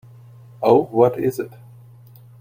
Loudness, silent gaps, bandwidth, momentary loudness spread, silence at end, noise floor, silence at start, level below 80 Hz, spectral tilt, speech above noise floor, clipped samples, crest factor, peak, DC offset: -18 LUFS; none; 16 kHz; 14 LU; 0.95 s; -45 dBFS; 0.6 s; -62 dBFS; -8 dB/octave; 28 dB; under 0.1%; 20 dB; -2 dBFS; under 0.1%